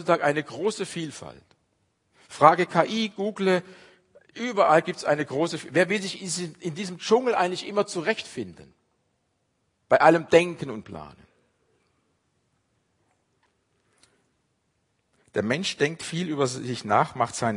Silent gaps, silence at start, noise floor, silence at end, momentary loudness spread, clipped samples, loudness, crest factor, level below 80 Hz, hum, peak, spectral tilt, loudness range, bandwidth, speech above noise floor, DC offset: none; 0 s; -73 dBFS; 0 s; 16 LU; under 0.1%; -24 LUFS; 26 dB; -70 dBFS; none; 0 dBFS; -4.5 dB/octave; 8 LU; 11 kHz; 49 dB; under 0.1%